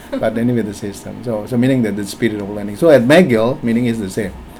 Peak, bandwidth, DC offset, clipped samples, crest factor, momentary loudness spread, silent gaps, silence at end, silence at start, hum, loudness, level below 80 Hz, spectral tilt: 0 dBFS; 16.5 kHz; under 0.1%; under 0.1%; 16 dB; 14 LU; none; 0 s; 0 s; none; -15 LUFS; -42 dBFS; -6.5 dB/octave